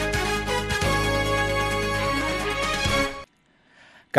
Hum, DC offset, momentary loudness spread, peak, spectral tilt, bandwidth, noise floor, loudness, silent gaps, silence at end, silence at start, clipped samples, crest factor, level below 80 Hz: none; under 0.1%; 3 LU; 0 dBFS; -4 dB/octave; 14.5 kHz; -61 dBFS; -24 LUFS; none; 0 s; 0 s; under 0.1%; 24 dB; -36 dBFS